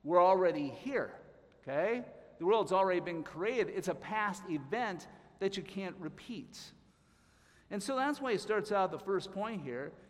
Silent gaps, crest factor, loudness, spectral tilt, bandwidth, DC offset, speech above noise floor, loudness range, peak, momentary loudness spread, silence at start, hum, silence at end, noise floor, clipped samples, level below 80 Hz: none; 20 dB; -35 LUFS; -5 dB/octave; 14.5 kHz; under 0.1%; 33 dB; 7 LU; -14 dBFS; 16 LU; 0.05 s; none; 0.1 s; -67 dBFS; under 0.1%; -72 dBFS